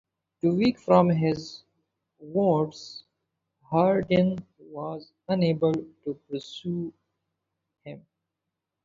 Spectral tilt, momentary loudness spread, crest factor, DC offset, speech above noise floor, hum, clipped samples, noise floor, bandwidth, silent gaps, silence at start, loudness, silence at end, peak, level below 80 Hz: -8 dB/octave; 21 LU; 22 dB; under 0.1%; 60 dB; none; under 0.1%; -85 dBFS; 7.4 kHz; none; 0.45 s; -26 LUFS; 0.85 s; -6 dBFS; -62 dBFS